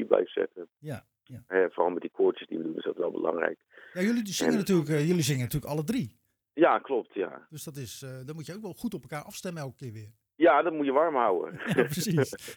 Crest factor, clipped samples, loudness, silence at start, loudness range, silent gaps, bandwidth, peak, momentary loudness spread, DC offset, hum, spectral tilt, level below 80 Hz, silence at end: 24 dB; under 0.1%; -28 LUFS; 0 s; 4 LU; none; over 20 kHz; -6 dBFS; 16 LU; under 0.1%; none; -5.5 dB/octave; -62 dBFS; 0 s